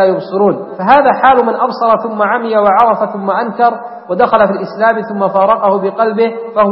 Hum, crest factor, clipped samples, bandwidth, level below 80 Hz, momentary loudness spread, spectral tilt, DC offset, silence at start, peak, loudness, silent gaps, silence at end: none; 12 dB; under 0.1%; 5.8 kHz; -50 dBFS; 6 LU; -8.5 dB/octave; under 0.1%; 0 s; 0 dBFS; -12 LUFS; none; 0 s